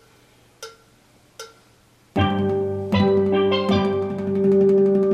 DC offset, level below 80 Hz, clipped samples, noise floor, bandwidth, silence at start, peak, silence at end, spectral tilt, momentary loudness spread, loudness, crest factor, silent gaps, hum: under 0.1%; -56 dBFS; under 0.1%; -55 dBFS; 9.8 kHz; 0.6 s; -6 dBFS; 0 s; -7.5 dB/octave; 24 LU; -20 LUFS; 16 dB; none; none